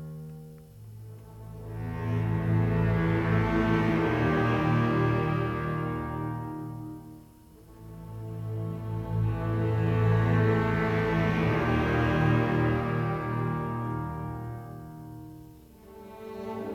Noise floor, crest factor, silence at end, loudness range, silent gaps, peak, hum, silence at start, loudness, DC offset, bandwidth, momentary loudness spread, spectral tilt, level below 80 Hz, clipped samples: -52 dBFS; 16 dB; 0 s; 10 LU; none; -12 dBFS; none; 0 s; -28 LUFS; under 0.1%; 11.5 kHz; 20 LU; -8.5 dB/octave; -44 dBFS; under 0.1%